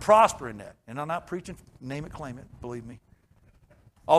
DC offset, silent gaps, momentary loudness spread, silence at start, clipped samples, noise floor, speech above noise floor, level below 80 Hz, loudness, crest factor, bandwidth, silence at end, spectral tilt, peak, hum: under 0.1%; none; 22 LU; 0 s; under 0.1%; -60 dBFS; 33 dB; -56 dBFS; -29 LUFS; 22 dB; 13.5 kHz; 0 s; -5 dB/octave; -6 dBFS; none